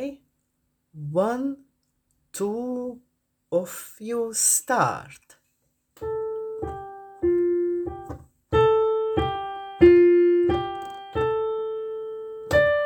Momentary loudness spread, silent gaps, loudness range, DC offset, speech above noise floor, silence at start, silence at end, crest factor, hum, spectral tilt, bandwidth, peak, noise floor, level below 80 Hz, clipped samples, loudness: 18 LU; none; 9 LU; under 0.1%; 48 dB; 0 s; 0 s; 20 dB; none; -4.5 dB/octave; 19.5 kHz; -4 dBFS; -74 dBFS; -48 dBFS; under 0.1%; -23 LUFS